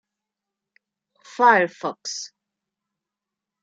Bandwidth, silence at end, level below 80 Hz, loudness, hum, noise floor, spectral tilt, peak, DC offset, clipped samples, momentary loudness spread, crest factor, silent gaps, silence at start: 8 kHz; 1.35 s; -84 dBFS; -20 LUFS; none; -87 dBFS; -3 dB/octave; -4 dBFS; under 0.1%; under 0.1%; 21 LU; 22 dB; none; 1.4 s